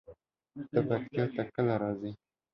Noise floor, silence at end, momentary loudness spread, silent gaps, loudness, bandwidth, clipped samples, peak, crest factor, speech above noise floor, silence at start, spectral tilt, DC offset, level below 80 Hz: -57 dBFS; 0.4 s; 17 LU; none; -33 LUFS; 5.8 kHz; under 0.1%; -14 dBFS; 20 dB; 25 dB; 0.1 s; -10.5 dB/octave; under 0.1%; -66 dBFS